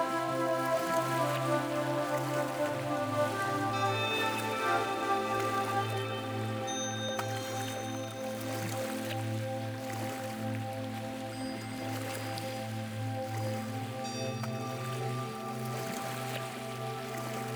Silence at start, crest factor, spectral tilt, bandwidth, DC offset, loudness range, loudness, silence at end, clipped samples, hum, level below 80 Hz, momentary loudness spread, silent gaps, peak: 0 s; 16 dB; -4.5 dB/octave; over 20 kHz; under 0.1%; 6 LU; -34 LUFS; 0 s; under 0.1%; none; -70 dBFS; 8 LU; none; -18 dBFS